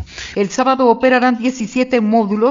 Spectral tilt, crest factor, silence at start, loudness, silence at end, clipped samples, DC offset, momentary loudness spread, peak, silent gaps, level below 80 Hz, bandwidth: -5 dB/octave; 14 dB; 0 s; -15 LUFS; 0 s; under 0.1%; under 0.1%; 7 LU; 0 dBFS; none; -48 dBFS; 7.6 kHz